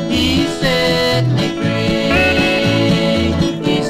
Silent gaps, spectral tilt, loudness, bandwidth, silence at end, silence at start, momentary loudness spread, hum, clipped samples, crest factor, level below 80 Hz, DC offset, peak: none; -5.5 dB/octave; -14 LUFS; 16 kHz; 0 s; 0 s; 4 LU; none; under 0.1%; 12 dB; -32 dBFS; 0.2%; -2 dBFS